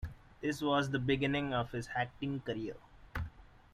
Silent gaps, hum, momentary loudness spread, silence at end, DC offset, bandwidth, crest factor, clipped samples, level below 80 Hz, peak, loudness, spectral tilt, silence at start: none; none; 14 LU; 0.25 s; under 0.1%; 15 kHz; 18 dB; under 0.1%; -54 dBFS; -20 dBFS; -36 LUFS; -6 dB/octave; 0 s